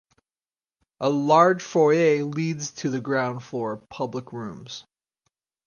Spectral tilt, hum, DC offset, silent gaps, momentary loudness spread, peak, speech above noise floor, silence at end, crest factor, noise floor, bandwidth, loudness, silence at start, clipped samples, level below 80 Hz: -5.5 dB/octave; none; under 0.1%; none; 18 LU; -4 dBFS; over 67 dB; 0.85 s; 20 dB; under -90 dBFS; 9.8 kHz; -23 LUFS; 1 s; under 0.1%; -68 dBFS